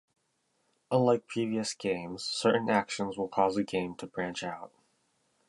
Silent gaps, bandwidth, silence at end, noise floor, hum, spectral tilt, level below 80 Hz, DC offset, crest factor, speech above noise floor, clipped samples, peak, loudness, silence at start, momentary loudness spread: none; 11.5 kHz; 0.8 s; -76 dBFS; none; -5 dB/octave; -70 dBFS; under 0.1%; 20 dB; 46 dB; under 0.1%; -12 dBFS; -31 LUFS; 0.9 s; 10 LU